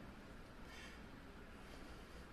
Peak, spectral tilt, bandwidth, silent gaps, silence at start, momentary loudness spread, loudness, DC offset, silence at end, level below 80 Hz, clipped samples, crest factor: -42 dBFS; -5 dB/octave; 13 kHz; none; 0 s; 3 LU; -57 LUFS; under 0.1%; 0 s; -60 dBFS; under 0.1%; 14 dB